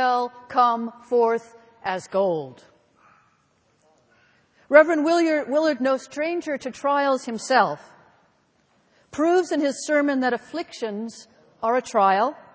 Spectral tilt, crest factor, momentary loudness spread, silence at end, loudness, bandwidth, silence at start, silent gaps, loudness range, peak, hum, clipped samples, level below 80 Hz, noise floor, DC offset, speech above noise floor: -4 dB/octave; 24 dB; 11 LU; 0.2 s; -22 LUFS; 8 kHz; 0 s; none; 6 LU; 0 dBFS; none; under 0.1%; -70 dBFS; -64 dBFS; under 0.1%; 43 dB